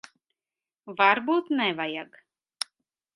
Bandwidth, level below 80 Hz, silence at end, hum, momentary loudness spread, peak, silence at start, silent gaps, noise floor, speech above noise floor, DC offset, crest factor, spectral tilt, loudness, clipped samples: 11.5 kHz; -80 dBFS; 1.1 s; none; 16 LU; -4 dBFS; 0.85 s; none; under -90 dBFS; over 65 dB; under 0.1%; 24 dB; -3.5 dB/octave; -25 LUFS; under 0.1%